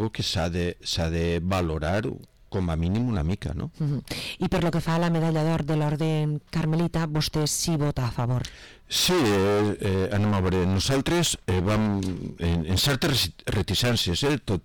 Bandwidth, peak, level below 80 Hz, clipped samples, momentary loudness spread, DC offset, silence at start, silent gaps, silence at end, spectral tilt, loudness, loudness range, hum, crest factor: 19 kHz; -16 dBFS; -40 dBFS; under 0.1%; 7 LU; 0.2%; 0 s; none; 0.05 s; -5 dB/octave; -25 LUFS; 4 LU; none; 8 dB